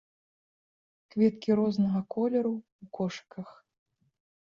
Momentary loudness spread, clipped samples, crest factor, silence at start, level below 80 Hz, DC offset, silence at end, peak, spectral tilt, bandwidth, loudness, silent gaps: 18 LU; under 0.1%; 18 dB; 1.15 s; -72 dBFS; under 0.1%; 0.9 s; -14 dBFS; -8 dB/octave; 7 kHz; -29 LUFS; 2.72-2.79 s